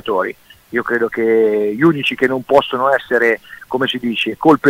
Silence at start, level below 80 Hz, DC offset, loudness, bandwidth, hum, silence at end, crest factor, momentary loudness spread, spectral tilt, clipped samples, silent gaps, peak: 0.05 s; -56 dBFS; under 0.1%; -16 LUFS; 16 kHz; none; 0 s; 16 dB; 8 LU; -6 dB/octave; under 0.1%; none; 0 dBFS